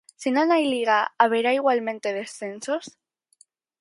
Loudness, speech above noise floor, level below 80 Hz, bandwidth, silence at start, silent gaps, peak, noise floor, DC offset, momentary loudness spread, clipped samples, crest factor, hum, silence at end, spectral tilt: -23 LUFS; 38 dB; -78 dBFS; 11.5 kHz; 0.2 s; none; -4 dBFS; -61 dBFS; under 0.1%; 11 LU; under 0.1%; 20 dB; none; 0.9 s; -3.5 dB/octave